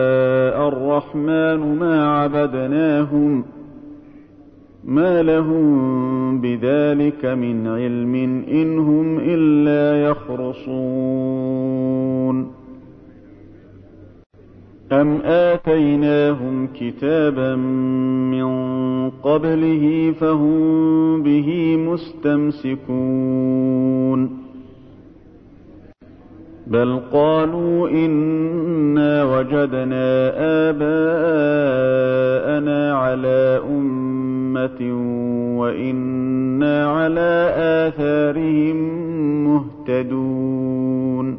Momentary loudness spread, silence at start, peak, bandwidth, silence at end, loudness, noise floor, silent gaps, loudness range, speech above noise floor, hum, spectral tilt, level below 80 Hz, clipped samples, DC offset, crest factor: 6 LU; 0 s; -4 dBFS; 5.2 kHz; 0 s; -18 LUFS; -45 dBFS; 14.26-14.30 s; 5 LU; 28 dB; none; -11 dB/octave; -52 dBFS; under 0.1%; under 0.1%; 14 dB